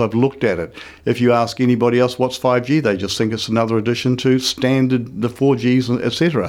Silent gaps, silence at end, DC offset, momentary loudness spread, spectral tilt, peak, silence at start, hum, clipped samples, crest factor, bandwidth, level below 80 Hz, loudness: none; 0 s; under 0.1%; 5 LU; -6 dB/octave; -4 dBFS; 0 s; none; under 0.1%; 14 dB; 16 kHz; -52 dBFS; -17 LUFS